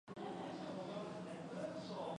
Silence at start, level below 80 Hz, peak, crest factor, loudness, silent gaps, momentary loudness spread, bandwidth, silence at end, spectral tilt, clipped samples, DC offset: 0.05 s; -80 dBFS; -34 dBFS; 14 dB; -47 LUFS; none; 2 LU; 11 kHz; 0 s; -6 dB/octave; under 0.1%; under 0.1%